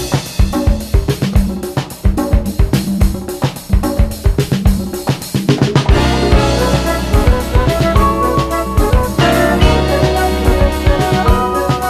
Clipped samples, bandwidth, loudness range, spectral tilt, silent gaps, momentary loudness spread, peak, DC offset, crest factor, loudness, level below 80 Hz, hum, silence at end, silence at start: under 0.1%; 14 kHz; 3 LU; -6 dB/octave; none; 6 LU; 0 dBFS; under 0.1%; 12 dB; -14 LUFS; -16 dBFS; none; 0 s; 0 s